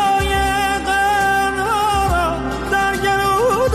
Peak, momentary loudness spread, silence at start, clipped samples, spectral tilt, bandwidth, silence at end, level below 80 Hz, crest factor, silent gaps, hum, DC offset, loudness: -6 dBFS; 3 LU; 0 s; under 0.1%; -4 dB/octave; 15.5 kHz; 0 s; -30 dBFS; 10 dB; none; none; under 0.1%; -17 LUFS